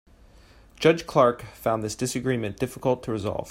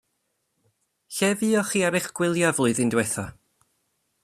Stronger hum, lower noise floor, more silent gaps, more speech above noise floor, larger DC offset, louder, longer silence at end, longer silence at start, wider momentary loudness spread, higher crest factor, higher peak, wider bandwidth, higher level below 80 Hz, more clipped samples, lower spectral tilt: neither; second, -52 dBFS vs -75 dBFS; neither; second, 28 dB vs 52 dB; neither; about the same, -25 LUFS vs -23 LUFS; second, 0 s vs 0.9 s; second, 0.8 s vs 1.1 s; about the same, 8 LU vs 8 LU; about the same, 20 dB vs 20 dB; about the same, -4 dBFS vs -6 dBFS; first, 16 kHz vs 14.5 kHz; first, -52 dBFS vs -62 dBFS; neither; first, -5.5 dB/octave vs -4 dB/octave